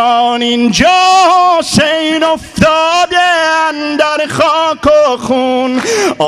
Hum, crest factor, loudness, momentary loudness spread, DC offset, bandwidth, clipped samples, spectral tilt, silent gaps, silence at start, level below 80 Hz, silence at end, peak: none; 10 dB; -10 LUFS; 6 LU; under 0.1%; 13.5 kHz; under 0.1%; -3.5 dB/octave; none; 0 s; -40 dBFS; 0 s; 0 dBFS